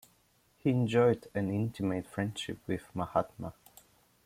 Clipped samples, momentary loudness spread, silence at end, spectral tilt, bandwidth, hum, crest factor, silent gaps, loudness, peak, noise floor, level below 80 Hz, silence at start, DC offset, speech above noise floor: under 0.1%; 12 LU; 0.75 s; -7 dB/octave; 16 kHz; none; 20 dB; none; -32 LUFS; -12 dBFS; -69 dBFS; -64 dBFS; 0.65 s; under 0.1%; 37 dB